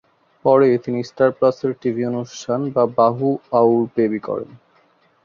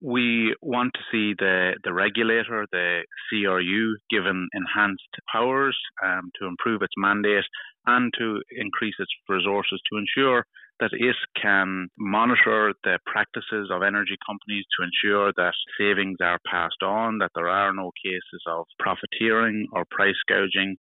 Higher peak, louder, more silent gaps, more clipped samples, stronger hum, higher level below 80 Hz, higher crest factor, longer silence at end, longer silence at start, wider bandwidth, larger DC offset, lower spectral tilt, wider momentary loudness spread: first, -2 dBFS vs -8 dBFS; first, -19 LUFS vs -24 LUFS; second, none vs 5.08-5.12 s; neither; neither; first, -62 dBFS vs -68 dBFS; about the same, 18 dB vs 16 dB; first, 0.7 s vs 0.05 s; first, 0.45 s vs 0 s; first, 7.4 kHz vs 4.1 kHz; neither; first, -7.5 dB/octave vs -1.5 dB/octave; first, 11 LU vs 8 LU